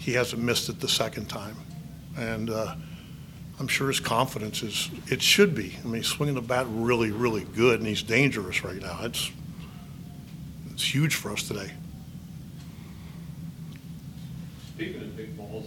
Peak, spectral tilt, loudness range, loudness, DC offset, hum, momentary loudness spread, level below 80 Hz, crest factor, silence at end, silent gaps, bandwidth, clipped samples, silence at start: -6 dBFS; -4 dB/octave; 14 LU; -27 LUFS; under 0.1%; none; 19 LU; -52 dBFS; 24 dB; 0 s; none; 19 kHz; under 0.1%; 0 s